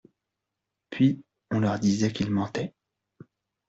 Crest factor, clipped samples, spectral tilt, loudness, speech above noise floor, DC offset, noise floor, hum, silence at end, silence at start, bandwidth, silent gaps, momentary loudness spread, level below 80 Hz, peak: 18 dB; under 0.1%; -6.5 dB/octave; -27 LUFS; 60 dB; under 0.1%; -85 dBFS; none; 1 s; 0.9 s; 8 kHz; none; 13 LU; -62 dBFS; -10 dBFS